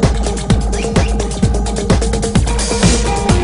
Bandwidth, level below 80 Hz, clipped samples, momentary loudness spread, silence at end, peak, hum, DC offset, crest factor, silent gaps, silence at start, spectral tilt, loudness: 11 kHz; -18 dBFS; under 0.1%; 4 LU; 0 s; 0 dBFS; none; under 0.1%; 14 dB; none; 0 s; -5 dB/octave; -15 LUFS